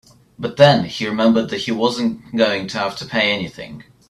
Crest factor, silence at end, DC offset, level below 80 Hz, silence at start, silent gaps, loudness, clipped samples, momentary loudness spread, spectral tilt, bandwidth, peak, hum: 18 dB; 0.25 s; under 0.1%; -56 dBFS; 0.4 s; none; -18 LUFS; under 0.1%; 16 LU; -5.5 dB/octave; 12 kHz; 0 dBFS; none